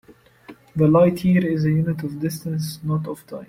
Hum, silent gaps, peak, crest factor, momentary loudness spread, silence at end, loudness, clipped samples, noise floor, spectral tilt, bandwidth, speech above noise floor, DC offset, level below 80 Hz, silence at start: none; none; -6 dBFS; 16 dB; 11 LU; 0.05 s; -20 LUFS; under 0.1%; -46 dBFS; -8 dB/octave; 16 kHz; 26 dB; under 0.1%; -52 dBFS; 0.5 s